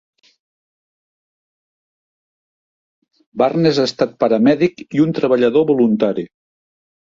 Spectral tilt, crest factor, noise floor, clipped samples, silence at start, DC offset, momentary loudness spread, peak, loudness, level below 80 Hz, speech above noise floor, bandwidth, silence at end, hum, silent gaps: -7 dB/octave; 16 dB; under -90 dBFS; under 0.1%; 3.35 s; under 0.1%; 6 LU; -2 dBFS; -16 LUFS; -60 dBFS; over 75 dB; 7.6 kHz; 0.85 s; none; none